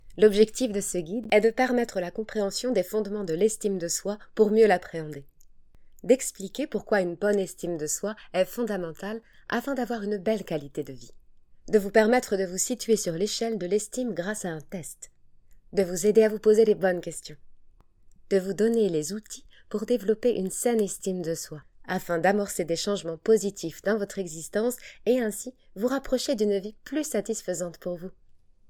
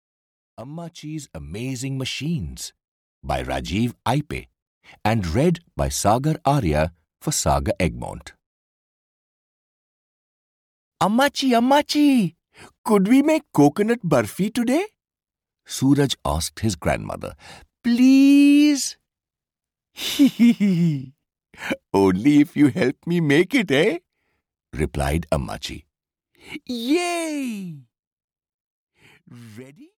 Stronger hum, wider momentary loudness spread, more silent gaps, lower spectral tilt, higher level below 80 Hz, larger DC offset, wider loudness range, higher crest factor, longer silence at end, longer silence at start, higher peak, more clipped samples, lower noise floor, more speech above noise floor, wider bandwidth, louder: neither; about the same, 15 LU vs 17 LU; second, none vs 2.88-3.22 s, 4.62-4.81 s, 8.46-10.91 s, 12.78-12.84 s, 28.07-28.17 s, 28.24-28.28 s, 28.54-28.87 s; about the same, -4.5 dB/octave vs -5.5 dB/octave; second, -54 dBFS vs -40 dBFS; neither; second, 4 LU vs 10 LU; about the same, 20 dB vs 16 dB; first, 0.35 s vs 0.15 s; second, 0.05 s vs 0.6 s; about the same, -6 dBFS vs -6 dBFS; neither; second, -54 dBFS vs -89 dBFS; second, 28 dB vs 69 dB; first, 19 kHz vs 16.5 kHz; second, -27 LUFS vs -20 LUFS